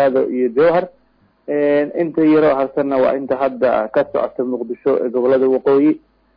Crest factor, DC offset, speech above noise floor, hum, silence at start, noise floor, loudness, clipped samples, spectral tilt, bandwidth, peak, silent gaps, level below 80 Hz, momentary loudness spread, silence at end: 10 dB; under 0.1%; 42 dB; none; 0 s; -57 dBFS; -16 LUFS; under 0.1%; -9.5 dB/octave; 5.2 kHz; -6 dBFS; none; -56 dBFS; 7 LU; 0.4 s